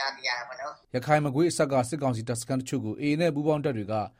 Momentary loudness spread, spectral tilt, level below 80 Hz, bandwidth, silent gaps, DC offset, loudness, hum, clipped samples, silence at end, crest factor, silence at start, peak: 8 LU; -5.5 dB/octave; -62 dBFS; 16 kHz; none; under 0.1%; -27 LUFS; none; under 0.1%; 0.1 s; 18 dB; 0 s; -10 dBFS